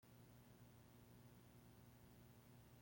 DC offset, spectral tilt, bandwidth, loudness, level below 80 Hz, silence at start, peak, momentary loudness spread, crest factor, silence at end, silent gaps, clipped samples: under 0.1%; -5.5 dB/octave; 16.5 kHz; -67 LUFS; -78 dBFS; 0 s; -54 dBFS; 1 LU; 12 dB; 0 s; none; under 0.1%